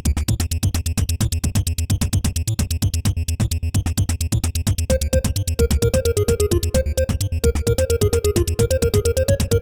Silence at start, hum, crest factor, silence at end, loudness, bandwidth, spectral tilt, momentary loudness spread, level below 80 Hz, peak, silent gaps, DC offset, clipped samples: 0.05 s; none; 14 dB; 0 s; -20 LUFS; over 20 kHz; -5.5 dB/octave; 4 LU; -24 dBFS; -4 dBFS; none; under 0.1%; under 0.1%